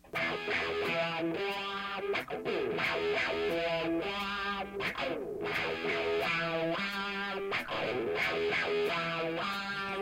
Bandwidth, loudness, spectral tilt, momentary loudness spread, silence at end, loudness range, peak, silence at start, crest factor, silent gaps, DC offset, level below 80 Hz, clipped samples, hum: 16 kHz; -33 LUFS; -4.5 dB/octave; 5 LU; 0 s; 1 LU; -20 dBFS; 0.05 s; 14 dB; none; under 0.1%; -62 dBFS; under 0.1%; none